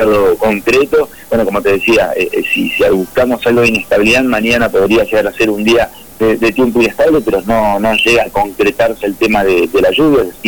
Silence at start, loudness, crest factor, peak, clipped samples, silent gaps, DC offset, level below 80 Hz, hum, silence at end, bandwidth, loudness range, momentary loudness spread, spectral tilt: 0 s; -11 LUFS; 8 dB; -4 dBFS; under 0.1%; none; 0.7%; -36 dBFS; none; 0 s; 19.5 kHz; 1 LU; 5 LU; -4.5 dB/octave